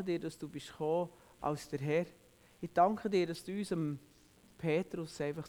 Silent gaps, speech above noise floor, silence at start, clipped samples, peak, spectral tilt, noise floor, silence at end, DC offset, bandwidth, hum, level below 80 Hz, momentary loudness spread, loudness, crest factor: none; 27 dB; 0 s; under 0.1%; -16 dBFS; -6.5 dB/octave; -63 dBFS; 0 s; under 0.1%; over 20 kHz; none; -68 dBFS; 14 LU; -36 LUFS; 20 dB